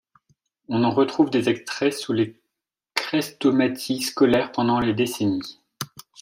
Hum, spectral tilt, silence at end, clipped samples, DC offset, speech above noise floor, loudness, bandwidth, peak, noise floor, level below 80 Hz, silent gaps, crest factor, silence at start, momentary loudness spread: none; -5 dB/octave; 0.2 s; under 0.1%; under 0.1%; 63 dB; -22 LUFS; 16 kHz; -2 dBFS; -84 dBFS; -58 dBFS; none; 20 dB; 0.7 s; 10 LU